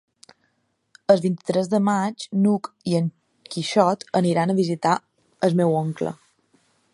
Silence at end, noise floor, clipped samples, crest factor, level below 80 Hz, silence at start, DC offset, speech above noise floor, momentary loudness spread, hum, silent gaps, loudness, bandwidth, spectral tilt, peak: 0.8 s; -70 dBFS; under 0.1%; 20 dB; -68 dBFS; 1.1 s; under 0.1%; 49 dB; 10 LU; none; none; -22 LUFS; 11.5 kHz; -6.5 dB/octave; -2 dBFS